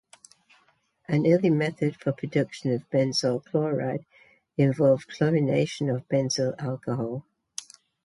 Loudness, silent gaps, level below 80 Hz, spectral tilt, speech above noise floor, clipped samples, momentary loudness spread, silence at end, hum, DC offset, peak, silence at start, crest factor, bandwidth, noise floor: -26 LUFS; none; -66 dBFS; -6 dB/octave; 41 dB; under 0.1%; 13 LU; 0.85 s; none; under 0.1%; -10 dBFS; 1.1 s; 18 dB; 11.5 kHz; -66 dBFS